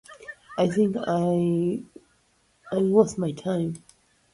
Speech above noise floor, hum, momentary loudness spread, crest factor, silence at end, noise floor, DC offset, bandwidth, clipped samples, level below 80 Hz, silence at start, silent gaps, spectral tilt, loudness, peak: 42 dB; none; 15 LU; 20 dB; 0.55 s; -65 dBFS; under 0.1%; 11.5 kHz; under 0.1%; -62 dBFS; 0.1 s; none; -7.5 dB/octave; -25 LUFS; -6 dBFS